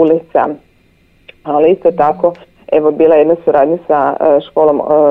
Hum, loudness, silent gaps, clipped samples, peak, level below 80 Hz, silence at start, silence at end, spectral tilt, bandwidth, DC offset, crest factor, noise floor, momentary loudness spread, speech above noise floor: none; -11 LUFS; none; under 0.1%; 0 dBFS; -52 dBFS; 0 s; 0 s; -9 dB/octave; 4 kHz; under 0.1%; 10 dB; -50 dBFS; 7 LU; 40 dB